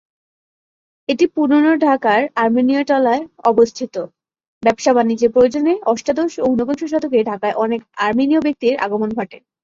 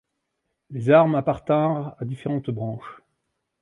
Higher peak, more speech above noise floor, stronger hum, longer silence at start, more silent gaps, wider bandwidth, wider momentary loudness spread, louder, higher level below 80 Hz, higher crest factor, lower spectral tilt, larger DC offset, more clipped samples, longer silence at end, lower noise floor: about the same, -2 dBFS vs -4 dBFS; first, over 74 dB vs 56 dB; neither; first, 1.1 s vs 0.7 s; first, 4.48-4.61 s vs none; second, 7.6 kHz vs 10.5 kHz; second, 8 LU vs 18 LU; first, -16 LUFS vs -22 LUFS; about the same, -56 dBFS vs -58 dBFS; about the same, 16 dB vs 20 dB; second, -5 dB/octave vs -9 dB/octave; neither; neither; second, 0.25 s vs 0.65 s; first, under -90 dBFS vs -78 dBFS